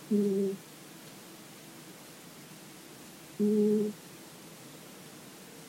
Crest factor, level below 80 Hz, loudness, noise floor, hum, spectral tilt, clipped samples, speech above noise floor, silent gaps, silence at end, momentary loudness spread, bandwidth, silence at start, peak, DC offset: 16 dB; -80 dBFS; -30 LUFS; -50 dBFS; none; -6.5 dB/octave; under 0.1%; 22 dB; none; 0 s; 20 LU; 16 kHz; 0 s; -18 dBFS; under 0.1%